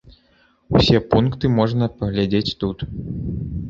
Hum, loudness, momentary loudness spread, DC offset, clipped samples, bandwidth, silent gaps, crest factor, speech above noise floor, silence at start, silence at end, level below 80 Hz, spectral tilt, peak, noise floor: none; -20 LUFS; 12 LU; under 0.1%; under 0.1%; 7.6 kHz; none; 18 dB; 39 dB; 0.05 s; 0 s; -36 dBFS; -7.5 dB/octave; -2 dBFS; -58 dBFS